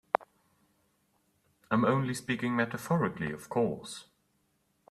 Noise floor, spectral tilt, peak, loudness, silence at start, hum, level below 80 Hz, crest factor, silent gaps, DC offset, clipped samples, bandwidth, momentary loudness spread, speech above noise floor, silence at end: -74 dBFS; -6 dB/octave; -6 dBFS; -31 LUFS; 0.2 s; none; -68 dBFS; 28 dB; none; under 0.1%; under 0.1%; 14 kHz; 11 LU; 44 dB; 0.9 s